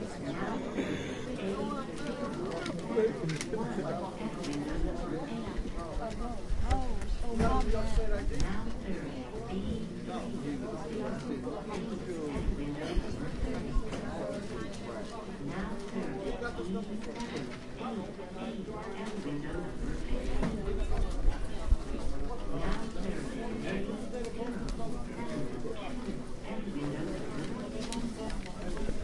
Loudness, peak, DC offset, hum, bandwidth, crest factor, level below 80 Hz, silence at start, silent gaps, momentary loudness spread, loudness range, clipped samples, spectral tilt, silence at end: -37 LUFS; -14 dBFS; under 0.1%; none; 11.5 kHz; 20 dB; -38 dBFS; 0 s; none; 5 LU; 4 LU; under 0.1%; -6 dB/octave; 0 s